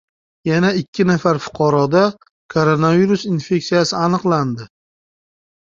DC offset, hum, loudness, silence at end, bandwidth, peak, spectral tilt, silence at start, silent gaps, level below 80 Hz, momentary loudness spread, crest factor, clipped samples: under 0.1%; none; -17 LUFS; 0.95 s; 7.6 kHz; -2 dBFS; -6.5 dB/octave; 0.45 s; 0.88-0.93 s, 2.31-2.49 s; -54 dBFS; 6 LU; 16 dB; under 0.1%